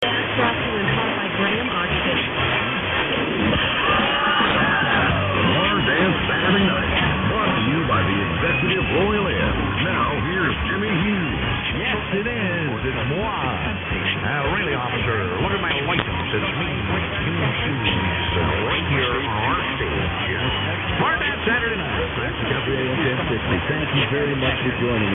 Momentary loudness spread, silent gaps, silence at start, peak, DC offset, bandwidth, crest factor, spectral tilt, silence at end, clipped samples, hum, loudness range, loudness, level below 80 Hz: 5 LU; none; 0 s; 0 dBFS; under 0.1%; 4 kHz; 20 dB; -8.5 dB/octave; 0 s; under 0.1%; none; 4 LU; -20 LUFS; -36 dBFS